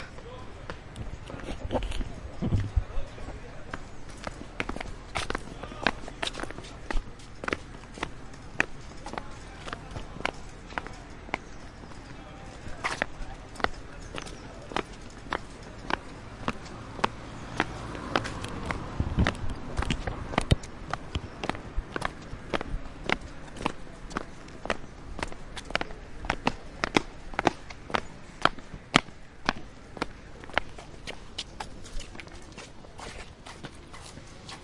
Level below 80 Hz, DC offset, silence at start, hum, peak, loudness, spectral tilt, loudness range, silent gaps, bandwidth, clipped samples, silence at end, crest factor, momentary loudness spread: -40 dBFS; under 0.1%; 0 s; none; -2 dBFS; -34 LUFS; -4.5 dB/octave; 7 LU; none; 11.5 kHz; under 0.1%; 0 s; 32 dB; 15 LU